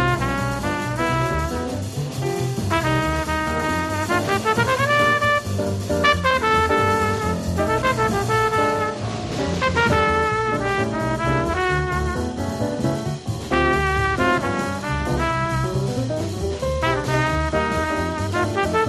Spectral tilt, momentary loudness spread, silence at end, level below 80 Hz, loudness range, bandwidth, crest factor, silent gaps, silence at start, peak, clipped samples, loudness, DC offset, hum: -5.5 dB/octave; 7 LU; 0 s; -36 dBFS; 4 LU; 14 kHz; 18 dB; none; 0 s; -4 dBFS; under 0.1%; -21 LUFS; under 0.1%; none